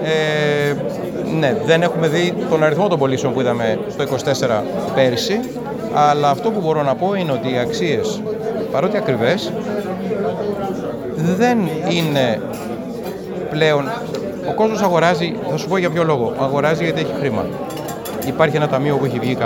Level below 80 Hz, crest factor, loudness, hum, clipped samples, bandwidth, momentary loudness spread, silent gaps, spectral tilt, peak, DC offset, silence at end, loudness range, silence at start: -52 dBFS; 18 dB; -18 LUFS; none; under 0.1%; over 20 kHz; 9 LU; none; -6 dB/octave; 0 dBFS; under 0.1%; 0 s; 3 LU; 0 s